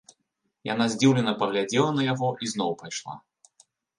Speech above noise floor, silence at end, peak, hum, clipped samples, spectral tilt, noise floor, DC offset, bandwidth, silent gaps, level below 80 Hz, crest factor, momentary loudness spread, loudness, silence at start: 53 dB; 0.8 s; -8 dBFS; none; under 0.1%; -5 dB/octave; -78 dBFS; under 0.1%; 11 kHz; none; -70 dBFS; 20 dB; 14 LU; -25 LUFS; 0.65 s